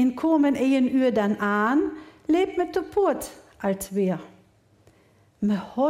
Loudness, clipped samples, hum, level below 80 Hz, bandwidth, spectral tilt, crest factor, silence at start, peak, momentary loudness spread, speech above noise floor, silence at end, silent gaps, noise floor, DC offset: -24 LUFS; under 0.1%; none; -58 dBFS; 16 kHz; -6 dB/octave; 12 dB; 0 s; -12 dBFS; 10 LU; 36 dB; 0 s; none; -59 dBFS; under 0.1%